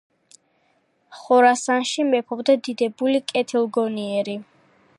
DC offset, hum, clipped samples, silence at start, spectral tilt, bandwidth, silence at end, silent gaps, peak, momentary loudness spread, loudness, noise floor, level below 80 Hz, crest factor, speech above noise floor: under 0.1%; none; under 0.1%; 1.1 s; -3.5 dB/octave; 11.5 kHz; 0.55 s; none; -4 dBFS; 9 LU; -21 LUFS; -65 dBFS; -78 dBFS; 18 dB; 45 dB